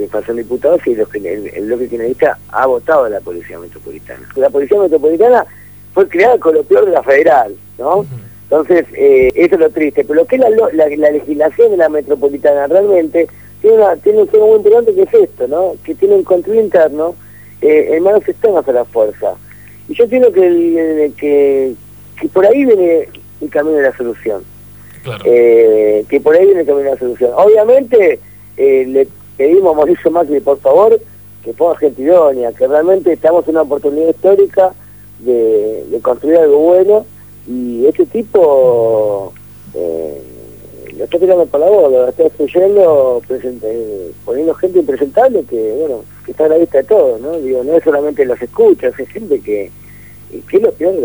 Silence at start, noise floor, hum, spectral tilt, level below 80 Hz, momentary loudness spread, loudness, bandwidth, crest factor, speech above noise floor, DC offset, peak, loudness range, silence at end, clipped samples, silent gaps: 0 s; -35 dBFS; 50 Hz at -45 dBFS; -7.5 dB/octave; -48 dBFS; 13 LU; -11 LUFS; over 20 kHz; 10 dB; 25 dB; 0.3%; 0 dBFS; 4 LU; 0 s; under 0.1%; none